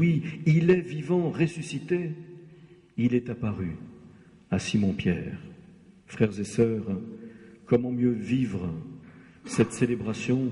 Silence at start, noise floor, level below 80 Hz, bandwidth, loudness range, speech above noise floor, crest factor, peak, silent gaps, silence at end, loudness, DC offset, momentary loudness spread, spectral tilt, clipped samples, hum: 0 s; -53 dBFS; -56 dBFS; 11.5 kHz; 4 LU; 27 dB; 18 dB; -8 dBFS; none; 0 s; -27 LUFS; under 0.1%; 18 LU; -7 dB/octave; under 0.1%; none